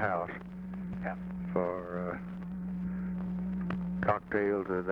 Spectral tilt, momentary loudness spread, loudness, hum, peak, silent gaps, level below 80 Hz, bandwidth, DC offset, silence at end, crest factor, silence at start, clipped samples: -10 dB/octave; 9 LU; -35 LUFS; none; -14 dBFS; none; -54 dBFS; 5 kHz; under 0.1%; 0 s; 20 dB; 0 s; under 0.1%